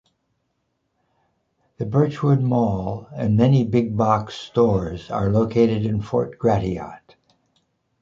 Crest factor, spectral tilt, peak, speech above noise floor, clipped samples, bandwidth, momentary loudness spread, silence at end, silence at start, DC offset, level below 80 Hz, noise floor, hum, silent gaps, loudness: 18 dB; -9 dB/octave; -4 dBFS; 53 dB; under 0.1%; 7.4 kHz; 10 LU; 1.05 s; 1.8 s; under 0.1%; -46 dBFS; -73 dBFS; none; none; -21 LUFS